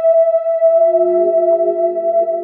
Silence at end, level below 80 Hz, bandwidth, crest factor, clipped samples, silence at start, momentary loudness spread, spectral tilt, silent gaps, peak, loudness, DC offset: 0 s; -68 dBFS; 2.8 kHz; 8 dB; under 0.1%; 0 s; 4 LU; -10.5 dB/octave; none; -4 dBFS; -14 LUFS; under 0.1%